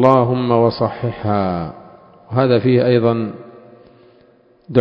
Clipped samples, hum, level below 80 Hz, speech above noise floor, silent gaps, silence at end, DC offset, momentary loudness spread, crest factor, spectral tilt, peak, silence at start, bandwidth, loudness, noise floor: under 0.1%; none; -48 dBFS; 36 dB; none; 0 s; under 0.1%; 11 LU; 16 dB; -9.5 dB/octave; 0 dBFS; 0 s; 5.4 kHz; -17 LUFS; -51 dBFS